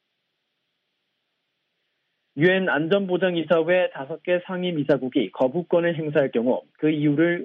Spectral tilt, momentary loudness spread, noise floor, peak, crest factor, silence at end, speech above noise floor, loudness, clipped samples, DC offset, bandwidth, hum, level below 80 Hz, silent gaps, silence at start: -9 dB/octave; 6 LU; -76 dBFS; -6 dBFS; 16 dB; 0 s; 55 dB; -22 LUFS; under 0.1%; under 0.1%; 5.2 kHz; none; -72 dBFS; none; 2.35 s